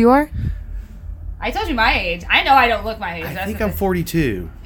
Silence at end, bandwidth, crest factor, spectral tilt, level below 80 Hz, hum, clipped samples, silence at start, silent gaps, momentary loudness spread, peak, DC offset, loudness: 0 s; 19 kHz; 18 dB; -5.5 dB/octave; -30 dBFS; none; under 0.1%; 0 s; none; 20 LU; 0 dBFS; under 0.1%; -18 LUFS